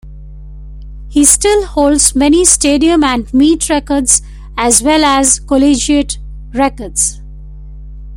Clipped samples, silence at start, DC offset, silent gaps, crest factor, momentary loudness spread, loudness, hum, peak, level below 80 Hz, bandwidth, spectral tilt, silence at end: 0.2%; 0.05 s; under 0.1%; none; 12 dB; 8 LU; -10 LUFS; 50 Hz at -30 dBFS; 0 dBFS; -28 dBFS; over 20 kHz; -2.5 dB/octave; 0 s